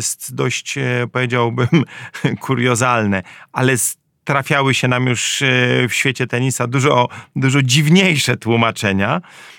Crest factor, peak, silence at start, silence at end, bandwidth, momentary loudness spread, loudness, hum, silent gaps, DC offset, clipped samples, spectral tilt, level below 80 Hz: 16 dB; 0 dBFS; 0 s; 0.05 s; 18 kHz; 8 LU; -16 LUFS; none; none; under 0.1%; under 0.1%; -4.5 dB/octave; -60 dBFS